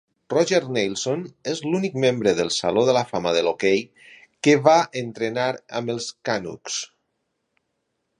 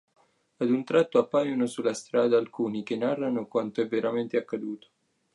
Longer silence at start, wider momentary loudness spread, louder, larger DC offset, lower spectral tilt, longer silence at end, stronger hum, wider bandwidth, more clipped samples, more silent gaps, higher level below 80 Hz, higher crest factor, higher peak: second, 0.3 s vs 0.6 s; first, 11 LU vs 8 LU; first, -22 LUFS vs -27 LUFS; neither; second, -4.5 dB/octave vs -6 dB/octave; first, 1.35 s vs 0.55 s; neither; about the same, 11 kHz vs 11.5 kHz; neither; neither; first, -62 dBFS vs -80 dBFS; about the same, 22 dB vs 18 dB; first, -2 dBFS vs -10 dBFS